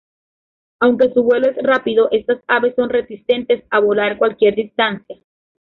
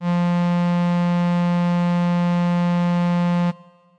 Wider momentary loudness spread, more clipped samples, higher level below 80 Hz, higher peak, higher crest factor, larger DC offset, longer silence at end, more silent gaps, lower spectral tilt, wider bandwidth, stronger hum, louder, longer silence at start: first, 5 LU vs 1 LU; neither; first, -58 dBFS vs -70 dBFS; first, -2 dBFS vs -16 dBFS; first, 14 dB vs 2 dB; second, under 0.1% vs 0.1%; about the same, 0.45 s vs 0.45 s; neither; second, -7 dB/octave vs -8.5 dB/octave; second, 4.7 kHz vs 6.6 kHz; neither; first, -16 LUFS vs -20 LUFS; first, 0.8 s vs 0 s